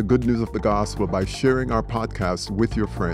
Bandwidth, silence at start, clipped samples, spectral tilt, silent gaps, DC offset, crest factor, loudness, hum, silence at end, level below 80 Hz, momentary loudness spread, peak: 13 kHz; 0 s; under 0.1%; -6.5 dB/octave; none; under 0.1%; 16 dB; -23 LUFS; none; 0 s; -34 dBFS; 5 LU; -6 dBFS